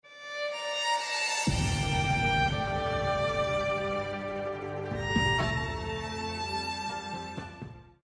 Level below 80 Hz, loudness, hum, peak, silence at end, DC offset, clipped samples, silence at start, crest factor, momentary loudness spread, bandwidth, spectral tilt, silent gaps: -44 dBFS; -30 LUFS; none; -14 dBFS; 0.25 s; under 0.1%; under 0.1%; 0.05 s; 16 dB; 10 LU; 10.5 kHz; -4.5 dB/octave; none